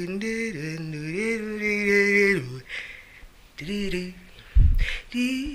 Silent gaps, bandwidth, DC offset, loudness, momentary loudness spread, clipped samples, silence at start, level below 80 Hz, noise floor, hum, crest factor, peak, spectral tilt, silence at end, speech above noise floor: none; 14 kHz; under 0.1%; -25 LUFS; 16 LU; under 0.1%; 0 s; -30 dBFS; -48 dBFS; none; 18 dB; -6 dBFS; -5.5 dB/octave; 0 s; 19 dB